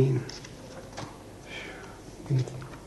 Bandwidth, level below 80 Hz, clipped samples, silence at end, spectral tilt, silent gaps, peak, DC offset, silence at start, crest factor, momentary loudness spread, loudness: 12 kHz; -54 dBFS; under 0.1%; 0 s; -6.5 dB/octave; none; -12 dBFS; under 0.1%; 0 s; 22 dB; 15 LU; -35 LUFS